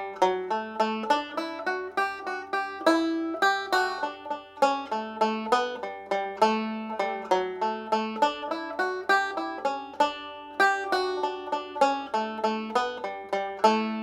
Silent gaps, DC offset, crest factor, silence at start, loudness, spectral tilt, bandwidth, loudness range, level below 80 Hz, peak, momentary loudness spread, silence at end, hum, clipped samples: none; under 0.1%; 20 dB; 0 s; -27 LUFS; -3.5 dB/octave; 16 kHz; 1 LU; -70 dBFS; -6 dBFS; 8 LU; 0 s; none; under 0.1%